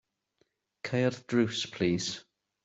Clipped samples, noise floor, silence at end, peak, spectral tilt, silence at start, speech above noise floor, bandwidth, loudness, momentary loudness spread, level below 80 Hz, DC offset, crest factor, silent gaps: under 0.1%; -75 dBFS; 0.45 s; -14 dBFS; -5 dB/octave; 0.85 s; 45 dB; 8 kHz; -30 LUFS; 10 LU; -68 dBFS; under 0.1%; 18 dB; none